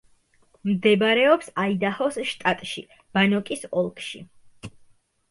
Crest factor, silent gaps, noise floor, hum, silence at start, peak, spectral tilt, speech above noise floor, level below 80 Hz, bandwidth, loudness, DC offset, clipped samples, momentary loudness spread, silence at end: 18 dB; none; -61 dBFS; none; 0.65 s; -6 dBFS; -5 dB/octave; 38 dB; -64 dBFS; 11.5 kHz; -23 LUFS; under 0.1%; under 0.1%; 21 LU; 0.6 s